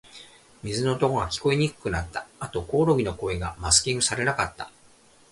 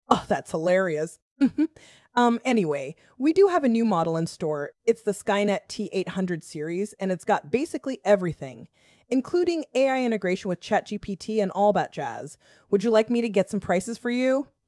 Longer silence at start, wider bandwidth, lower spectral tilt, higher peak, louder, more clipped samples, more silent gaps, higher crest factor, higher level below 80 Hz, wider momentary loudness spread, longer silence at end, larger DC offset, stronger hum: about the same, 0.15 s vs 0.1 s; about the same, 11.5 kHz vs 12 kHz; second, -3.5 dB/octave vs -6 dB/octave; about the same, -4 dBFS vs -2 dBFS; about the same, -25 LUFS vs -25 LUFS; neither; second, none vs 1.22-1.36 s; about the same, 22 dB vs 24 dB; first, -44 dBFS vs -62 dBFS; first, 15 LU vs 9 LU; first, 0.6 s vs 0.25 s; neither; neither